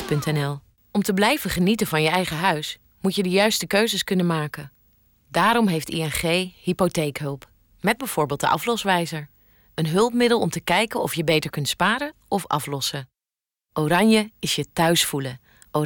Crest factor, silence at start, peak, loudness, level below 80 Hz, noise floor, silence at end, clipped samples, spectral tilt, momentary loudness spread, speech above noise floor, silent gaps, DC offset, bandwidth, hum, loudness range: 14 dB; 0 s; -8 dBFS; -22 LUFS; -52 dBFS; under -90 dBFS; 0 s; under 0.1%; -4.5 dB/octave; 11 LU; over 68 dB; none; under 0.1%; 20 kHz; none; 3 LU